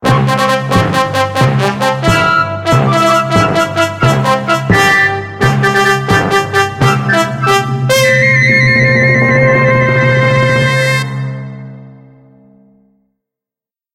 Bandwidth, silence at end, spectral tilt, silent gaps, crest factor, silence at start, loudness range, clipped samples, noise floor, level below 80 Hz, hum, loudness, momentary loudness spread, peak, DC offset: 15.5 kHz; 2 s; -5.5 dB/octave; none; 12 dB; 0 s; 5 LU; under 0.1%; -89 dBFS; -36 dBFS; none; -10 LUFS; 6 LU; 0 dBFS; under 0.1%